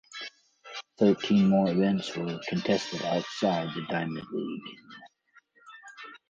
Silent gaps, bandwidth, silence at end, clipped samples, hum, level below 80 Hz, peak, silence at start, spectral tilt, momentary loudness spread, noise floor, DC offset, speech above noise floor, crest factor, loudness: none; 7.6 kHz; 0.15 s; under 0.1%; none; -66 dBFS; -10 dBFS; 0.1 s; -6.5 dB/octave; 22 LU; -63 dBFS; under 0.1%; 36 dB; 18 dB; -28 LUFS